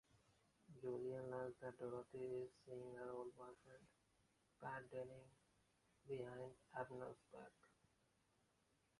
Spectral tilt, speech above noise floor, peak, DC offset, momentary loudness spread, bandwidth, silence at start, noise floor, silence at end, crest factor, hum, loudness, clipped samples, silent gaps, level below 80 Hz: -7 dB/octave; 30 dB; -34 dBFS; under 0.1%; 13 LU; 11 kHz; 0.15 s; -83 dBFS; 1.35 s; 22 dB; none; -54 LUFS; under 0.1%; none; -84 dBFS